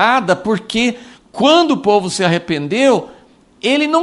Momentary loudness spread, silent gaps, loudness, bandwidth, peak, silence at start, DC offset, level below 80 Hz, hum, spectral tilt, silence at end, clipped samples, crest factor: 7 LU; none; -15 LUFS; 11.5 kHz; 0 dBFS; 0 s; under 0.1%; -52 dBFS; none; -4.5 dB/octave; 0 s; under 0.1%; 14 dB